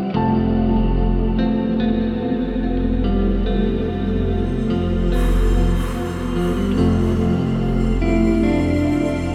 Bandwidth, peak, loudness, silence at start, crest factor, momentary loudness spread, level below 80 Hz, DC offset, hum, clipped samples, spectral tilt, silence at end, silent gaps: 11 kHz; -4 dBFS; -19 LUFS; 0 s; 12 dB; 4 LU; -22 dBFS; under 0.1%; none; under 0.1%; -8 dB/octave; 0 s; none